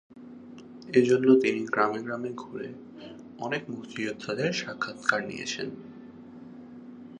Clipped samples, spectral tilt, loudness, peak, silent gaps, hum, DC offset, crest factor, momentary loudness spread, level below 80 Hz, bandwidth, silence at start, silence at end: under 0.1%; -5 dB/octave; -28 LUFS; -6 dBFS; none; none; under 0.1%; 24 dB; 24 LU; -72 dBFS; 10 kHz; 0.15 s; 0 s